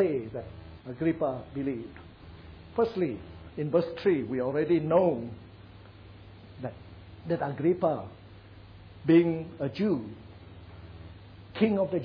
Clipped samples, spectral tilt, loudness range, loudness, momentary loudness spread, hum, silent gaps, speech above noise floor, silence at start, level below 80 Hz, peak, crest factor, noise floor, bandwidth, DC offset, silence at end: under 0.1%; -10 dB/octave; 5 LU; -29 LUFS; 25 LU; none; none; 22 dB; 0 s; -56 dBFS; -10 dBFS; 20 dB; -50 dBFS; 5.4 kHz; under 0.1%; 0 s